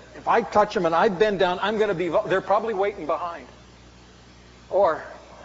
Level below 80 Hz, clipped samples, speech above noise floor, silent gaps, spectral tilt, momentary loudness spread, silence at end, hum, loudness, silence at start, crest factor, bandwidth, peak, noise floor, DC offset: -54 dBFS; under 0.1%; 27 dB; none; -3.5 dB/octave; 8 LU; 0 s; 60 Hz at -55 dBFS; -23 LUFS; 0 s; 18 dB; 7.6 kHz; -6 dBFS; -49 dBFS; under 0.1%